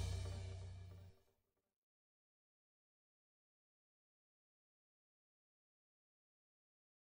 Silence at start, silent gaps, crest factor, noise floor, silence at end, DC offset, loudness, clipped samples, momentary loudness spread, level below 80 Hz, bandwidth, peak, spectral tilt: 0 s; none; 22 dB; -85 dBFS; 5.95 s; under 0.1%; -51 LUFS; under 0.1%; 16 LU; -62 dBFS; 16 kHz; -34 dBFS; -5 dB/octave